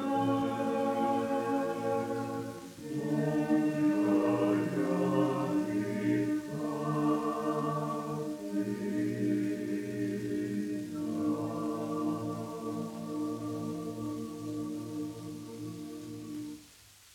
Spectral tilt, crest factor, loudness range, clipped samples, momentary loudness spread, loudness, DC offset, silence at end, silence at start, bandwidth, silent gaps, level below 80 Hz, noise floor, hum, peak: -7 dB/octave; 16 dB; 8 LU; under 0.1%; 12 LU; -33 LUFS; under 0.1%; 0.4 s; 0 s; 16.5 kHz; none; -70 dBFS; -57 dBFS; none; -16 dBFS